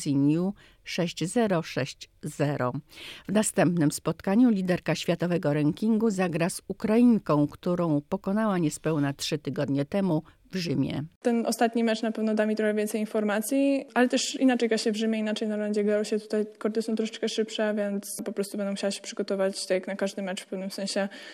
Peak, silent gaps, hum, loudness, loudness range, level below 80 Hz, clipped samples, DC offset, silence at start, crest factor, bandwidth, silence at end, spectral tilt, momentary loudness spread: -10 dBFS; 11.16-11.21 s; none; -27 LUFS; 4 LU; -64 dBFS; under 0.1%; under 0.1%; 0 s; 18 dB; 16 kHz; 0 s; -5.5 dB/octave; 8 LU